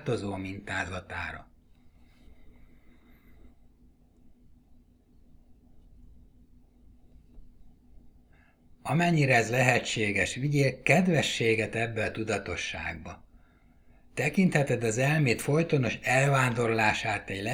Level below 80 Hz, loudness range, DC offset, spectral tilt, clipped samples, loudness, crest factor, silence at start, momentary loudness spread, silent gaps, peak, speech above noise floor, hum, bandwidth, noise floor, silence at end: -56 dBFS; 14 LU; under 0.1%; -5 dB/octave; under 0.1%; -27 LUFS; 24 dB; 0 s; 13 LU; none; -6 dBFS; 32 dB; none; 16.5 kHz; -60 dBFS; 0 s